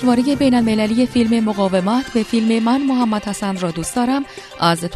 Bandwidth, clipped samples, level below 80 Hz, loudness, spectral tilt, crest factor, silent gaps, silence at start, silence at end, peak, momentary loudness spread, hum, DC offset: 13.5 kHz; under 0.1%; -46 dBFS; -17 LUFS; -5.5 dB/octave; 16 dB; none; 0 s; 0 s; -2 dBFS; 6 LU; none; under 0.1%